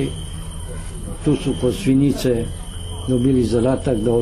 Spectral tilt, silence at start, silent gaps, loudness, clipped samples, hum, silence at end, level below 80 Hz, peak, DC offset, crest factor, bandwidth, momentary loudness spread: -7 dB/octave; 0 s; none; -19 LUFS; under 0.1%; none; 0 s; -32 dBFS; -6 dBFS; under 0.1%; 14 dB; 13.5 kHz; 14 LU